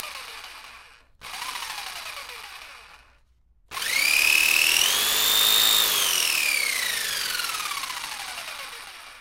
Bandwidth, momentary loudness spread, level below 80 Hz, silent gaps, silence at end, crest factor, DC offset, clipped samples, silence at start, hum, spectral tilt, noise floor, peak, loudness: 16 kHz; 21 LU; -58 dBFS; none; 0 s; 22 dB; under 0.1%; under 0.1%; 0 s; none; 2.5 dB/octave; -60 dBFS; -4 dBFS; -20 LUFS